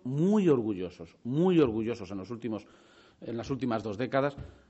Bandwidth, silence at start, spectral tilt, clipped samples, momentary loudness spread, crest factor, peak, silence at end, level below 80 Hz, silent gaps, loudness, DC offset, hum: 8 kHz; 0.05 s; -7 dB/octave; under 0.1%; 15 LU; 18 dB; -12 dBFS; 0.2 s; -60 dBFS; none; -30 LUFS; under 0.1%; none